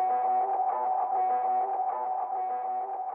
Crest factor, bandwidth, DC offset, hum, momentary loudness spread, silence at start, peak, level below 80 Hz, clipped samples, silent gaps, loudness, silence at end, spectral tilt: 8 dB; 2.9 kHz; under 0.1%; none; 5 LU; 0 s; -20 dBFS; under -90 dBFS; under 0.1%; none; -29 LUFS; 0 s; -6.5 dB/octave